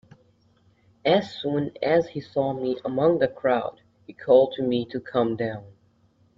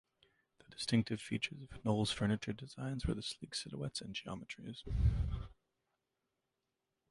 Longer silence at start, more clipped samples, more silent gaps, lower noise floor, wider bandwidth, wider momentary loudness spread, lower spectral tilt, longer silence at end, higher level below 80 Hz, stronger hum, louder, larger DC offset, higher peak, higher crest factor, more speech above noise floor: first, 1.05 s vs 0.7 s; neither; neither; second, -62 dBFS vs -88 dBFS; second, 7.2 kHz vs 11.5 kHz; about the same, 10 LU vs 12 LU; first, -7.5 dB/octave vs -5.5 dB/octave; second, 0.7 s vs 1.6 s; second, -64 dBFS vs -46 dBFS; neither; first, -24 LUFS vs -39 LUFS; neither; first, -6 dBFS vs -20 dBFS; about the same, 20 dB vs 20 dB; second, 39 dB vs 50 dB